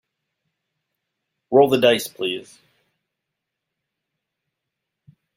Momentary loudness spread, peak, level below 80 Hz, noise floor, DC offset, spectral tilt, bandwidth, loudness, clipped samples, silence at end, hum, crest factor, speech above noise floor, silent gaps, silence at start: 12 LU; -2 dBFS; -68 dBFS; -82 dBFS; under 0.1%; -4.5 dB/octave; 16 kHz; -18 LUFS; under 0.1%; 2.95 s; none; 22 dB; 64 dB; none; 1.5 s